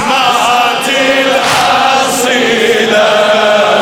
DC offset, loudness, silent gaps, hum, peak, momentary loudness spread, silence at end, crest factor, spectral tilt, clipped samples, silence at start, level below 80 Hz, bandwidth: under 0.1%; -8 LUFS; none; none; 0 dBFS; 2 LU; 0 s; 10 dB; -2 dB/octave; under 0.1%; 0 s; -48 dBFS; 18 kHz